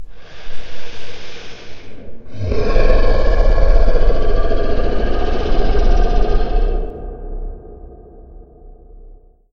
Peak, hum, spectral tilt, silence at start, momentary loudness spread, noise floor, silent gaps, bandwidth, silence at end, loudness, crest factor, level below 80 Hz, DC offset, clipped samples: 0 dBFS; none; -7 dB/octave; 0 s; 22 LU; -41 dBFS; none; 6 kHz; 0.85 s; -19 LUFS; 12 dB; -16 dBFS; under 0.1%; under 0.1%